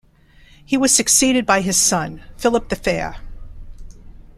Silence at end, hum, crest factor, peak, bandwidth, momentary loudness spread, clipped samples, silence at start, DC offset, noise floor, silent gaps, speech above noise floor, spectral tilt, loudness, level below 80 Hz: 0.2 s; none; 18 dB; 0 dBFS; 15.5 kHz; 11 LU; under 0.1%; 0.7 s; under 0.1%; -49 dBFS; none; 32 dB; -2.5 dB/octave; -16 LUFS; -38 dBFS